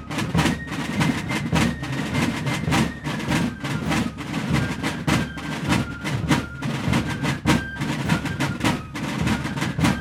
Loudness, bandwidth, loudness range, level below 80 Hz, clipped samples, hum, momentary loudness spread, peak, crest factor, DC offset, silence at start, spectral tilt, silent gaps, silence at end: -24 LUFS; 16.5 kHz; 1 LU; -38 dBFS; under 0.1%; none; 6 LU; -4 dBFS; 20 dB; under 0.1%; 0 s; -5 dB/octave; none; 0 s